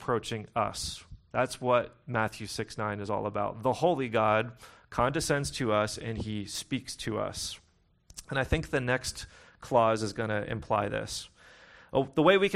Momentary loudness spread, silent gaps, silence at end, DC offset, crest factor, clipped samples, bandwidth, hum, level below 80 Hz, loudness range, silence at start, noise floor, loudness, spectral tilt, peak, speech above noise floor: 11 LU; none; 0 s; under 0.1%; 20 dB; under 0.1%; 15 kHz; none; -50 dBFS; 4 LU; 0 s; -60 dBFS; -30 LUFS; -4.5 dB/octave; -10 dBFS; 31 dB